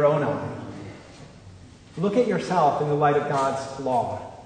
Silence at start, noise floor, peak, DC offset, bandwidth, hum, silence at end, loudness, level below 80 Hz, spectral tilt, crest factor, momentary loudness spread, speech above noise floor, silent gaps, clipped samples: 0 s; -46 dBFS; -8 dBFS; under 0.1%; 9.6 kHz; none; 0 s; -24 LUFS; -58 dBFS; -6.5 dB/octave; 16 dB; 18 LU; 23 dB; none; under 0.1%